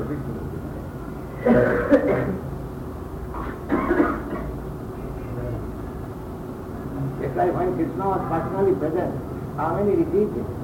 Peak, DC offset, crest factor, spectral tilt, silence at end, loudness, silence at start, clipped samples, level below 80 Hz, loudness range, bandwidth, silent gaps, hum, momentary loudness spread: -6 dBFS; under 0.1%; 18 dB; -9 dB/octave; 0 s; -25 LUFS; 0 s; under 0.1%; -38 dBFS; 6 LU; 16.5 kHz; none; none; 15 LU